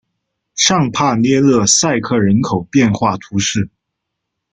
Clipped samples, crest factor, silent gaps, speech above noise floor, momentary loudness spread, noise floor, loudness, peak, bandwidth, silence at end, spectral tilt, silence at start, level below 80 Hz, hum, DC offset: under 0.1%; 16 dB; none; 63 dB; 7 LU; -76 dBFS; -14 LUFS; 0 dBFS; 9.6 kHz; 0.85 s; -4 dB/octave; 0.55 s; -48 dBFS; none; under 0.1%